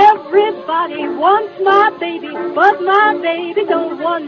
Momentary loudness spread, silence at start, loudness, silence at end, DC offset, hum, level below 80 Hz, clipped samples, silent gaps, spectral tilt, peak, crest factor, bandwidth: 9 LU; 0 s; -14 LUFS; 0 s; under 0.1%; none; -62 dBFS; under 0.1%; none; -5 dB/octave; 0 dBFS; 14 dB; 6.6 kHz